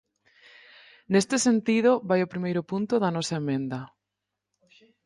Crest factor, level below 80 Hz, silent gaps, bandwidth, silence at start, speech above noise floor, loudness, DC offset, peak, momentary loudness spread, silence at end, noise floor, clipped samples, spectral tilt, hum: 18 dB; -70 dBFS; none; 11.5 kHz; 1.1 s; 60 dB; -25 LUFS; under 0.1%; -8 dBFS; 8 LU; 1.2 s; -85 dBFS; under 0.1%; -5 dB/octave; none